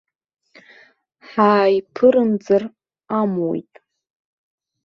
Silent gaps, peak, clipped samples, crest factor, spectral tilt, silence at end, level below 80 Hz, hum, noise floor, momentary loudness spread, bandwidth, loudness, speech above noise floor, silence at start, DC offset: none; -2 dBFS; under 0.1%; 18 dB; -8 dB/octave; 1.25 s; -66 dBFS; none; -52 dBFS; 12 LU; 6.8 kHz; -18 LUFS; 35 dB; 1.3 s; under 0.1%